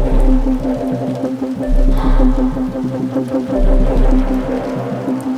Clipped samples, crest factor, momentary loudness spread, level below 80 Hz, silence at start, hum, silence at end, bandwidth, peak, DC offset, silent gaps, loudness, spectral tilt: under 0.1%; 12 dB; 5 LU; -16 dBFS; 0 s; none; 0 s; 6 kHz; 0 dBFS; under 0.1%; none; -17 LUFS; -8.5 dB/octave